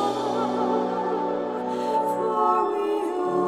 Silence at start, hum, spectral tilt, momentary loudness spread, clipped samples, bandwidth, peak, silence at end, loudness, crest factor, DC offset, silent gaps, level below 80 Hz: 0 s; none; -6 dB/octave; 5 LU; under 0.1%; 14 kHz; -10 dBFS; 0 s; -25 LUFS; 14 dB; under 0.1%; none; -66 dBFS